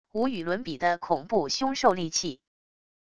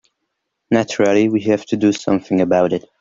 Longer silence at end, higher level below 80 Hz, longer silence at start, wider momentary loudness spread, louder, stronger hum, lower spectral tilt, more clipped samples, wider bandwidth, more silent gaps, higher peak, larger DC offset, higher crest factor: first, 0.65 s vs 0.2 s; about the same, -62 dBFS vs -58 dBFS; second, 0.05 s vs 0.7 s; about the same, 7 LU vs 5 LU; second, -27 LUFS vs -17 LUFS; neither; second, -3.5 dB/octave vs -6 dB/octave; neither; first, 11 kHz vs 7.6 kHz; neither; second, -8 dBFS vs -2 dBFS; first, 0.4% vs under 0.1%; first, 22 dB vs 14 dB